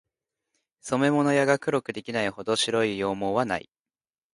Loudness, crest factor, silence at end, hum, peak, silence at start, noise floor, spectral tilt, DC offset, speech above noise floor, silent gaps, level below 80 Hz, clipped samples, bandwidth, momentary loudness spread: -25 LUFS; 20 dB; 0.75 s; none; -6 dBFS; 0.85 s; under -90 dBFS; -4.5 dB/octave; under 0.1%; over 65 dB; none; -64 dBFS; under 0.1%; 11.5 kHz; 8 LU